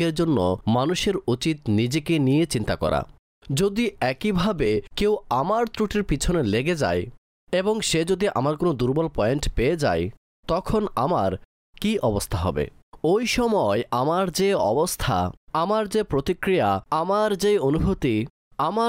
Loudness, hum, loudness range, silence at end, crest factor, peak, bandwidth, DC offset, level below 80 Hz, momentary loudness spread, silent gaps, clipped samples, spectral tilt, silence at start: -23 LUFS; none; 2 LU; 0 s; 12 dB; -12 dBFS; 16 kHz; under 0.1%; -40 dBFS; 6 LU; 3.19-3.42 s, 7.18-7.47 s, 10.17-10.43 s, 11.45-11.73 s, 12.83-12.92 s, 15.37-15.47 s, 18.30-18.51 s; under 0.1%; -5.5 dB/octave; 0 s